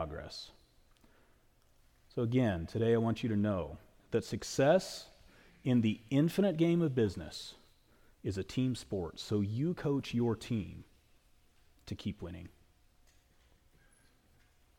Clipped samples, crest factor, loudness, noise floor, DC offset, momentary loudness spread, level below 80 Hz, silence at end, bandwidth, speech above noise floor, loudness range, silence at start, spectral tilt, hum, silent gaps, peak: under 0.1%; 18 dB; -34 LUFS; -67 dBFS; under 0.1%; 17 LU; -60 dBFS; 2.3 s; 17 kHz; 34 dB; 14 LU; 0 s; -6.5 dB/octave; none; none; -16 dBFS